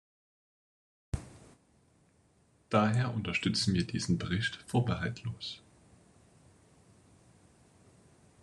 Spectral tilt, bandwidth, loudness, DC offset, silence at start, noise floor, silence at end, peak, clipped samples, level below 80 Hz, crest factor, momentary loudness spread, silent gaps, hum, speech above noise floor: -5.5 dB/octave; 11.5 kHz; -32 LUFS; under 0.1%; 1.15 s; -68 dBFS; 2.85 s; -12 dBFS; under 0.1%; -56 dBFS; 24 dB; 13 LU; none; none; 36 dB